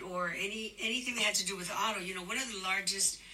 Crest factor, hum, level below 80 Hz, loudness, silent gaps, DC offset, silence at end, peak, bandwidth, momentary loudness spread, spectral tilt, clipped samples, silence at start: 20 dB; none; -66 dBFS; -33 LUFS; none; under 0.1%; 0 s; -16 dBFS; 16 kHz; 6 LU; -1 dB/octave; under 0.1%; 0 s